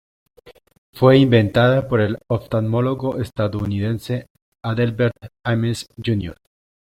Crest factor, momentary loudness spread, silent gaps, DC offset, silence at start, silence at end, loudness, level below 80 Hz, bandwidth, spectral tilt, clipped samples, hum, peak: 18 dB; 12 LU; 0.78-0.93 s, 4.30-4.35 s, 4.42-4.52 s; under 0.1%; 0.45 s; 0.55 s; -19 LUFS; -48 dBFS; 15.5 kHz; -7.5 dB/octave; under 0.1%; none; -2 dBFS